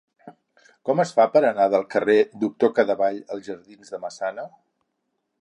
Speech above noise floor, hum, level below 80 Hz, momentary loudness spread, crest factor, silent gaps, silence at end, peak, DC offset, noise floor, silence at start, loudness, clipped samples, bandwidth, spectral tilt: 55 dB; none; -74 dBFS; 19 LU; 20 dB; none; 0.95 s; -4 dBFS; under 0.1%; -76 dBFS; 0.25 s; -21 LUFS; under 0.1%; 10 kHz; -6 dB/octave